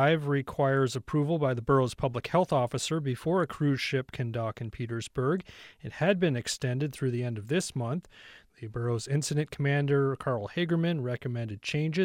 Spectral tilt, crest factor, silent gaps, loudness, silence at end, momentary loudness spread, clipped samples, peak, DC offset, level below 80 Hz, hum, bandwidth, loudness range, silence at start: -6 dB/octave; 16 dB; none; -30 LUFS; 0 s; 9 LU; under 0.1%; -12 dBFS; under 0.1%; -58 dBFS; none; 15.5 kHz; 3 LU; 0 s